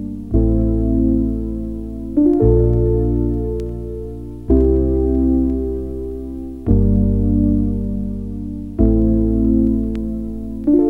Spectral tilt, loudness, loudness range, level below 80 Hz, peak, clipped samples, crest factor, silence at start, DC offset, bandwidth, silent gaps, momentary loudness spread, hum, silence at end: -12.5 dB/octave; -18 LUFS; 2 LU; -22 dBFS; -2 dBFS; under 0.1%; 16 dB; 0 s; under 0.1%; 1.9 kHz; none; 12 LU; none; 0 s